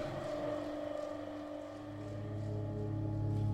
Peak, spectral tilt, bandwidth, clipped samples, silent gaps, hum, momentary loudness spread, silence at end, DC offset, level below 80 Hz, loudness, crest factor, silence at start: -26 dBFS; -8 dB/octave; 9 kHz; under 0.1%; none; none; 8 LU; 0 s; under 0.1%; -56 dBFS; -41 LUFS; 12 dB; 0 s